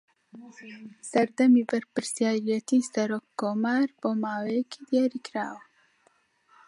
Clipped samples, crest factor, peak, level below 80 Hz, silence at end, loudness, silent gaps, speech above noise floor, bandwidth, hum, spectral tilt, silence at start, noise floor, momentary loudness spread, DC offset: under 0.1%; 18 dB; -10 dBFS; -82 dBFS; 1.1 s; -27 LUFS; none; 40 dB; 11.5 kHz; none; -5 dB/octave; 0.35 s; -67 dBFS; 19 LU; under 0.1%